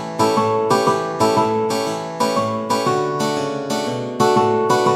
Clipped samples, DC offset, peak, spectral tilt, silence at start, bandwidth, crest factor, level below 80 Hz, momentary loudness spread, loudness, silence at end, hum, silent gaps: under 0.1%; under 0.1%; -4 dBFS; -5 dB/octave; 0 s; 15.5 kHz; 14 dB; -60 dBFS; 6 LU; -18 LUFS; 0 s; none; none